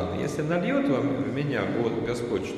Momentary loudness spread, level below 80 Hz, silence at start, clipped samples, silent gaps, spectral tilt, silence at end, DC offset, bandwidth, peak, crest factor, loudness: 4 LU; -54 dBFS; 0 s; under 0.1%; none; -7 dB/octave; 0 s; under 0.1%; 13 kHz; -12 dBFS; 14 dB; -27 LUFS